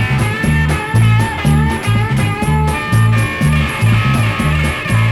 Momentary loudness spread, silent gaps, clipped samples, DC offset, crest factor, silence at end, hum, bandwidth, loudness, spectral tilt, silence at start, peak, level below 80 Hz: 3 LU; none; under 0.1%; under 0.1%; 12 dB; 0 s; none; 13 kHz; -14 LUFS; -6 dB/octave; 0 s; -2 dBFS; -24 dBFS